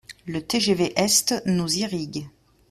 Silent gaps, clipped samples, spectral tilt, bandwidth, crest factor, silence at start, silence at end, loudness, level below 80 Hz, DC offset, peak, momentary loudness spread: none; under 0.1%; -3.5 dB/octave; 15.5 kHz; 22 dB; 0.1 s; 0.4 s; -22 LUFS; -58 dBFS; under 0.1%; -2 dBFS; 14 LU